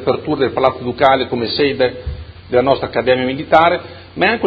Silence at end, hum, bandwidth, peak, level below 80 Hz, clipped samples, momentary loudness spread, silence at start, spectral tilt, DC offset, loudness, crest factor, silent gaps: 0 s; none; 6.6 kHz; 0 dBFS; -38 dBFS; under 0.1%; 10 LU; 0 s; -7.5 dB/octave; under 0.1%; -15 LUFS; 16 dB; none